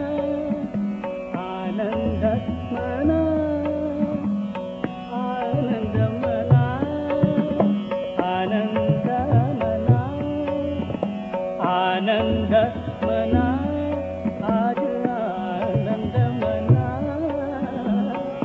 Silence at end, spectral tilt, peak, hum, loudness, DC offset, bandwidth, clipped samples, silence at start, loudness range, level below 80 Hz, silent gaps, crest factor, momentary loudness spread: 0 s; -7 dB/octave; -4 dBFS; none; -23 LUFS; under 0.1%; 5.8 kHz; under 0.1%; 0 s; 2 LU; -46 dBFS; none; 18 dB; 7 LU